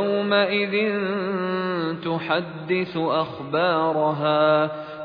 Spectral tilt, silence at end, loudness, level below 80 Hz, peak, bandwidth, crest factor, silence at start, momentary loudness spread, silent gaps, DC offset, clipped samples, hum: -8.5 dB/octave; 0 s; -23 LUFS; -66 dBFS; -6 dBFS; 5.2 kHz; 16 dB; 0 s; 6 LU; none; under 0.1%; under 0.1%; none